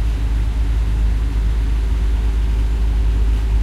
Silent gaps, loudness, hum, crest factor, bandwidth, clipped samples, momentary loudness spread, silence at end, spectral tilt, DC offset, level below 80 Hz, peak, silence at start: none; -20 LUFS; none; 8 dB; 6.8 kHz; under 0.1%; 2 LU; 0 s; -7 dB/octave; under 0.1%; -16 dBFS; -8 dBFS; 0 s